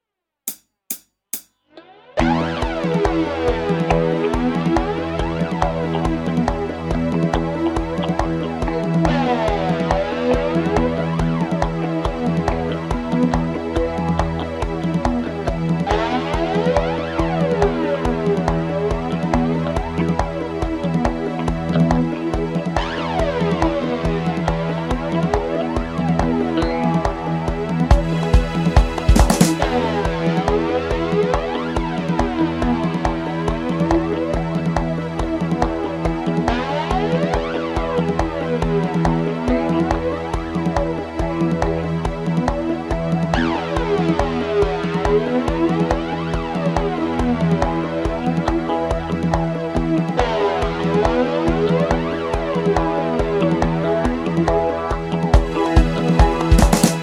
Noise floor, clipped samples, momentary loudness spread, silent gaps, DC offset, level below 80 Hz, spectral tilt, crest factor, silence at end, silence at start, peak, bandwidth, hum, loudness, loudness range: -46 dBFS; under 0.1%; 5 LU; none; under 0.1%; -26 dBFS; -6.5 dB/octave; 18 dB; 0 s; 0.45 s; 0 dBFS; 16 kHz; none; -20 LUFS; 3 LU